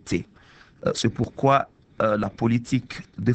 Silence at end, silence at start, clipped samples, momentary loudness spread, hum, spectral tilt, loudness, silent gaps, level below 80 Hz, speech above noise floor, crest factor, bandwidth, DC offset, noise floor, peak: 0 s; 0.05 s; under 0.1%; 11 LU; none; -6 dB/octave; -24 LUFS; none; -52 dBFS; 29 dB; 20 dB; 8.8 kHz; under 0.1%; -52 dBFS; -4 dBFS